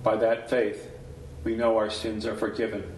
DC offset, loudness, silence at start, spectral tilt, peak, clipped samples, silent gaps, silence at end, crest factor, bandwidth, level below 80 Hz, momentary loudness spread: under 0.1%; -27 LUFS; 0 s; -5.5 dB/octave; -10 dBFS; under 0.1%; none; 0 s; 18 dB; 12 kHz; -50 dBFS; 17 LU